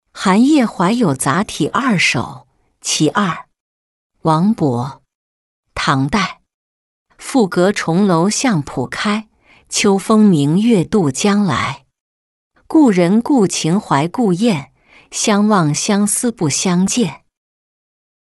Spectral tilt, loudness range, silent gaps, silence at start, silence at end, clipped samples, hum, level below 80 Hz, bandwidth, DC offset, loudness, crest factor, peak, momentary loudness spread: -5 dB/octave; 4 LU; 3.60-4.10 s, 5.15-5.63 s, 6.54-7.06 s, 12.00-12.51 s; 0.15 s; 1.1 s; under 0.1%; none; -50 dBFS; 12 kHz; under 0.1%; -15 LUFS; 14 dB; -2 dBFS; 10 LU